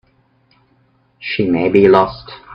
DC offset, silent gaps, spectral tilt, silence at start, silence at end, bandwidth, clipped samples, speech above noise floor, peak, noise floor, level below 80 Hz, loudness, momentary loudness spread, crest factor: under 0.1%; none; -8.5 dB/octave; 1.2 s; 0 s; 5.6 kHz; under 0.1%; 43 dB; 0 dBFS; -57 dBFS; -48 dBFS; -13 LUFS; 18 LU; 16 dB